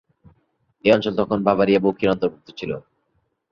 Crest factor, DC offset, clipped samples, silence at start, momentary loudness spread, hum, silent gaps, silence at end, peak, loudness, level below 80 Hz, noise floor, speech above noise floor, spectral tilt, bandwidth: 20 dB; under 0.1%; under 0.1%; 0.85 s; 13 LU; none; none; 0.7 s; -2 dBFS; -20 LUFS; -54 dBFS; -70 dBFS; 50 dB; -7.5 dB/octave; 7.4 kHz